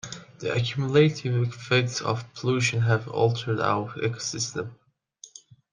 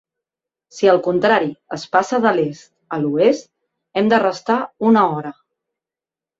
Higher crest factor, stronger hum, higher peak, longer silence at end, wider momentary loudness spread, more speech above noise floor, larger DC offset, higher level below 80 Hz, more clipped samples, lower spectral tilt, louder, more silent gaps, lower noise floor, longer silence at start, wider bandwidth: about the same, 20 dB vs 18 dB; neither; second, -6 dBFS vs -2 dBFS; second, 0.45 s vs 1.05 s; first, 14 LU vs 11 LU; second, 28 dB vs 73 dB; neither; about the same, -64 dBFS vs -64 dBFS; neither; about the same, -5 dB/octave vs -6 dB/octave; second, -25 LUFS vs -17 LUFS; neither; second, -52 dBFS vs -89 dBFS; second, 0.05 s vs 0.75 s; first, 9.8 kHz vs 7.8 kHz